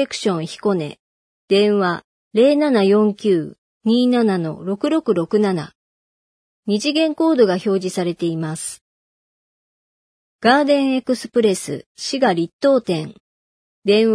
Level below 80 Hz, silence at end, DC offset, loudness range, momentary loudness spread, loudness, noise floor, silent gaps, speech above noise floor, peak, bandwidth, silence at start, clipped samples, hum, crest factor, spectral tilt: -66 dBFS; 0 s; under 0.1%; 4 LU; 11 LU; -18 LUFS; under -90 dBFS; 0.99-1.48 s, 2.04-2.31 s, 3.58-3.81 s, 5.75-6.63 s, 8.81-10.39 s, 11.86-11.95 s, 12.53-12.59 s, 13.20-13.82 s; over 73 dB; -2 dBFS; 11 kHz; 0 s; under 0.1%; none; 18 dB; -5.5 dB/octave